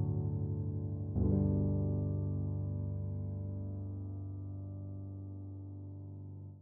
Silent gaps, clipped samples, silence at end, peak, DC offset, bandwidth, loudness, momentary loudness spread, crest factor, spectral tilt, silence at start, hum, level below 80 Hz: none; under 0.1%; 0 s; -18 dBFS; under 0.1%; 1.4 kHz; -38 LUFS; 15 LU; 18 dB; -15 dB/octave; 0 s; none; -50 dBFS